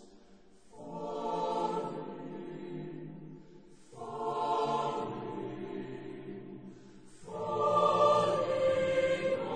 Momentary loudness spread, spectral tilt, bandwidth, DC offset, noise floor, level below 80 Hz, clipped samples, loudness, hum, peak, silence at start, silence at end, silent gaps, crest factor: 20 LU; -5.5 dB/octave; 9.6 kHz; 0.1%; -60 dBFS; -68 dBFS; under 0.1%; -33 LUFS; none; -14 dBFS; 0 s; 0 s; none; 20 dB